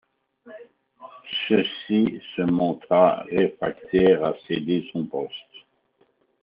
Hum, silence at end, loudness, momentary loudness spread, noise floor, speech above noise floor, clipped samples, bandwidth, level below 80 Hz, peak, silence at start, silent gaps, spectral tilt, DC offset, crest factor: none; 1 s; -23 LUFS; 12 LU; -65 dBFS; 43 dB; under 0.1%; 5.2 kHz; -60 dBFS; -4 dBFS; 0.45 s; none; -4.5 dB/octave; under 0.1%; 20 dB